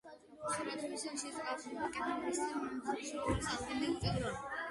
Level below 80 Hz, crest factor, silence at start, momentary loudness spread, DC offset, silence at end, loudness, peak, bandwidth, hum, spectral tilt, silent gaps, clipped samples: -56 dBFS; 18 dB; 0.05 s; 5 LU; under 0.1%; 0 s; -39 LUFS; -22 dBFS; 11.5 kHz; none; -4 dB/octave; none; under 0.1%